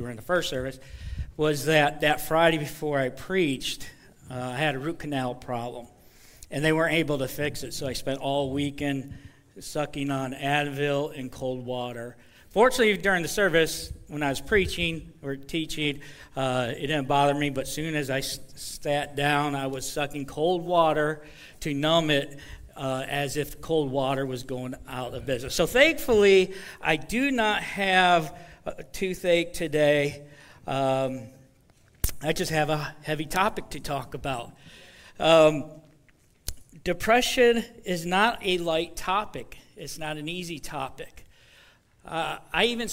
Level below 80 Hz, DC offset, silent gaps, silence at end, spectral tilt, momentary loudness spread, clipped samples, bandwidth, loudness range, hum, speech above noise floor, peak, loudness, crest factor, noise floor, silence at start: -46 dBFS; under 0.1%; none; 0 s; -4.5 dB/octave; 16 LU; under 0.1%; 16 kHz; 6 LU; none; 34 dB; -6 dBFS; -26 LUFS; 22 dB; -60 dBFS; 0 s